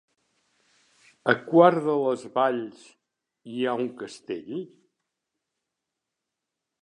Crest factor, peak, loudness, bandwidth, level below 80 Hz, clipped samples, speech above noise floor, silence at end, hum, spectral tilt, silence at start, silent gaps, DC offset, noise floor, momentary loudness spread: 24 dB; -4 dBFS; -24 LUFS; 10.5 kHz; -80 dBFS; under 0.1%; 61 dB; 2.2 s; none; -6.5 dB/octave; 1.25 s; none; under 0.1%; -85 dBFS; 20 LU